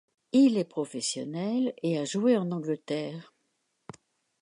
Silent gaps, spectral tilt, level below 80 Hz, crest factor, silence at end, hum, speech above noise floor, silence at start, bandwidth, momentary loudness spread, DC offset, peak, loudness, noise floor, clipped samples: none; -5.5 dB/octave; -80 dBFS; 16 dB; 1.2 s; none; 49 dB; 0.35 s; 11 kHz; 11 LU; under 0.1%; -12 dBFS; -28 LUFS; -77 dBFS; under 0.1%